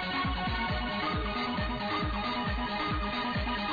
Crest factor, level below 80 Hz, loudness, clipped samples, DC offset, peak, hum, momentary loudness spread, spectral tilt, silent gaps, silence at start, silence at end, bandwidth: 8 dB; -40 dBFS; -32 LUFS; under 0.1%; under 0.1%; -24 dBFS; none; 1 LU; -7 dB/octave; none; 0 s; 0 s; 5 kHz